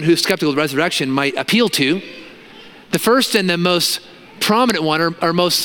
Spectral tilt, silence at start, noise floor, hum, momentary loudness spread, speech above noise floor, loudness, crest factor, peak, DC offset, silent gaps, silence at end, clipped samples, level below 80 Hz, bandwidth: -3.5 dB/octave; 0 s; -40 dBFS; none; 7 LU; 24 dB; -16 LUFS; 18 dB; 0 dBFS; under 0.1%; none; 0 s; under 0.1%; -58 dBFS; 17.5 kHz